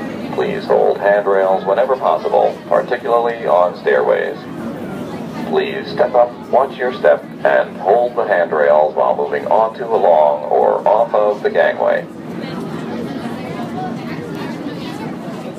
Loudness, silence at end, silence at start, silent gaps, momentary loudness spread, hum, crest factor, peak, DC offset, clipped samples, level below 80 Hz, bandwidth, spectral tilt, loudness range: -16 LUFS; 0 s; 0 s; none; 12 LU; none; 16 dB; 0 dBFS; under 0.1%; under 0.1%; -58 dBFS; 13.5 kHz; -6.5 dB/octave; 6 LU